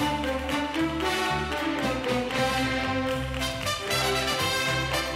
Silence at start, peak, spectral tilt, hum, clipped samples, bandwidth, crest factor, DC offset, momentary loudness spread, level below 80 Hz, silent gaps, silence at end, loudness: 0 s; -12 dBFS; -3.5 dB/octave; none; under 0.1%; 16 kHz; 14 dB; under 0.1%; 4 LU; -42 dBFS; none; 0 s; -26 LUFS